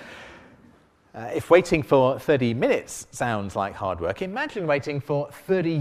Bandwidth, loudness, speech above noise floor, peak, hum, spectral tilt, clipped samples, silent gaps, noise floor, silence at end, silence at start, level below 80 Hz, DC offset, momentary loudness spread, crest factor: 15.5 kHz; -24 LUFS; 33 dB; -2 dBFS; none; -6 dB/octave; under 0.1%; none; -56 dBFS; 0 s; 0 s; -54 dBFS; under 0.1%; 12 LU; 22 dB